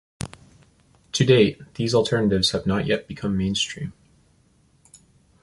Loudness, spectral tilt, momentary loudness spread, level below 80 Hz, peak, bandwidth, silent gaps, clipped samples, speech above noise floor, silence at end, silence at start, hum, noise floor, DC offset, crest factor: -22 LUFS; -5 dB/octave; 18 LU; -48 dBFS; -2 dBFS; 11.5 kHz; none; under 0.1%; 39 dB; 1.55 s; 0.2 s; none; -60 dBFS; under 0.1%; 22 dB